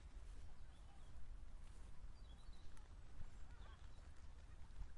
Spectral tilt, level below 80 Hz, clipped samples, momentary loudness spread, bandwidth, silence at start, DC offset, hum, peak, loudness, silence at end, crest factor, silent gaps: -5 dB/octave; -58 dBFS; under 0.1%; 2 LU; 11 kHz; 0 s; under 0.1%; none; -38 dBFS; -63 LUFS; 0 s; 14 dB; none